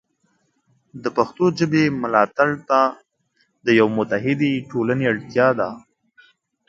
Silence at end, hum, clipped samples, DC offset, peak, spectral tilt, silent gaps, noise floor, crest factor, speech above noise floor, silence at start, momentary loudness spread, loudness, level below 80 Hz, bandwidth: 0.9 s; none; under 0.1%; under 0.1%; 0 dBFS; -6.5 dB/octave; none; -67 dBFS; 20 dB; 48 dB; 0.95 s; 8 LU; -20 LUFS; -62 dBFS; 7.6 kHz